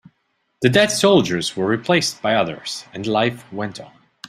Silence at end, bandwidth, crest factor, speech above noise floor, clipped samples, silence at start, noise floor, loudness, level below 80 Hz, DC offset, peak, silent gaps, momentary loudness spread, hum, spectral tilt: 0.4 s; 15.5 kHz; 18 dB; 50 dB; under 0.1%; 0.6 s; -69 dBFS; -19 LUFS; -58 dBFS; under 0.1%; -2 dBFS; none; 14 LU; none; -4 dB/octave